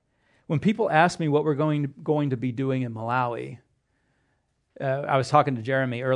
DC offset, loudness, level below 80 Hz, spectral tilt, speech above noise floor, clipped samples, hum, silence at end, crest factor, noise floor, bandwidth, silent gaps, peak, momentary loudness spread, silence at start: under 0.1%; -25 LUFS; -68 dBFS; -7 dB/octave; 48 dB; under 0.1%; none; 0 s; 22 dB; -72 dBFS; 10.5 kHz; none; -4 dBFS; 9 LU; 0.5 s